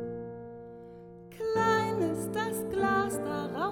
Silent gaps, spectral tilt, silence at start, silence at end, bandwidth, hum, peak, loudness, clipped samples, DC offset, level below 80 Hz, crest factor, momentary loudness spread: none; -5 dB/octave; 0 s; 0 s; 18.5 kHz; none; -14 dBFS; -30 LUFS; under 0.1%; under 0.1%; -60 dBFS; 18 dB; 21 LU